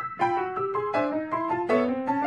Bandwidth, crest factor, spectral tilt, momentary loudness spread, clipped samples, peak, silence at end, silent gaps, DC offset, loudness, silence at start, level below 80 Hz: 10 kHz; 16 dB; -7 dB/octave; 4 LU; under 0.1%; -10 dBFS; 0 s; none; under 0.1%; -27 LUFS; 0 s; -64 dBFS